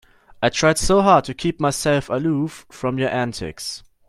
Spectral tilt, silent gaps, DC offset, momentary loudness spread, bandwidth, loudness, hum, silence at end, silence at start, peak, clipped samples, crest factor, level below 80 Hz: -4.5 dB/octave; none; under 0.1%; 13 LU; 14 kHz; -20 LUFS; none; 0.3 s; 0.4 s; -2 dBFS; under 0.1%; 20 dB; -40 dBFS